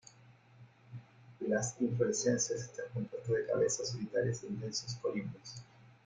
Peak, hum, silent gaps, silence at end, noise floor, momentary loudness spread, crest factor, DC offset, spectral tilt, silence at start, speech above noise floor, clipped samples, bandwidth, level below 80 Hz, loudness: -18 dBFS; none; none; 0.15 s; -61 dBFS; 18 LU; 18 dB; under 0.1%; -4.5 dB/octave; 0.25 s; 26 dB; under 0.1%; 9.6 kHz; -70 dBFS; -36 LUFS